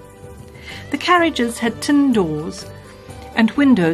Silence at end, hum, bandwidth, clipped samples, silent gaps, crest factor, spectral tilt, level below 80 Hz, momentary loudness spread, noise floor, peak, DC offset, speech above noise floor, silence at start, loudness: 0 s; none; 13.5 kHz; under 0.1%; none; 16 dB; -5 dB/octave; -46 dBFS; 23 LU; -38 dBFS; -2 dBFS; under 0.1%; 22 dB; 0 s; -17 LUFS